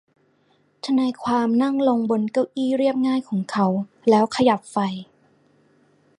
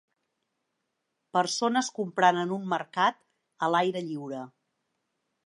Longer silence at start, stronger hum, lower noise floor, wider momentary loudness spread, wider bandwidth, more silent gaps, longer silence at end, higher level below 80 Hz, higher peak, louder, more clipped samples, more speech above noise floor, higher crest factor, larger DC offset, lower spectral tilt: second, 0.85 s vs 1.35 s; neither; second, -62 dBFS vs -81 dBFS; second, 7 LU vs 12 LU; about the same, 11 kHz vs 11.5 kHz; neither; first, 1.15 s vs 1 s; first, -66 dBFS vs -84 dBFS; first, -4 dBFS vs -8 dBFS; first, -21 LUFS vs -28 LUFS; neither; second, 42 dB vs 54 dB; about the same, 18 dB vs 22 dB; neither; first, -6.5 dB/octave vs -4 dB/octave